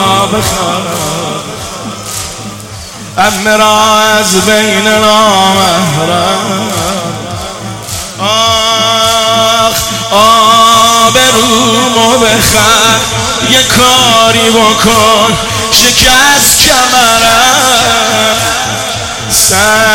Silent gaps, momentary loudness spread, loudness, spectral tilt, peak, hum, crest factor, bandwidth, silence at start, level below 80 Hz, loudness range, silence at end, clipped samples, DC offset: none; 14 LU; -6 LUFS; -2 dB/octave; 0 dBFS; none; 8 dB; over 20 kHz; 0 s; -32 dBFS; 6 LU; 0 s; 1%; 0.4%